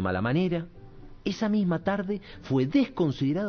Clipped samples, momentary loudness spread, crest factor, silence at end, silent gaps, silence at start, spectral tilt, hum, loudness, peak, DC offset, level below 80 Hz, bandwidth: under 0.1%; 9 LU; 14 dB; 0 s; none; 0 s; -8 dB/octave; none; -28 LUFS; -12 dBFS; under 0.1%; -52 dBFS; 6.6 kHz